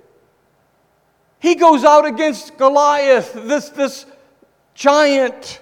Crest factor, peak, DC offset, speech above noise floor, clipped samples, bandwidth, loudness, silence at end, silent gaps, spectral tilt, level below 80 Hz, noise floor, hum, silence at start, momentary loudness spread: 16 dB; 0 dBFS; under 0.1%; 46 dB; under 0.1%; 15.5 kHz; -14 LUFS; 0.05 s; none; -3 dB/octave; -64 dBFS; -59 dBFS; none; 1.45 s; 11 LU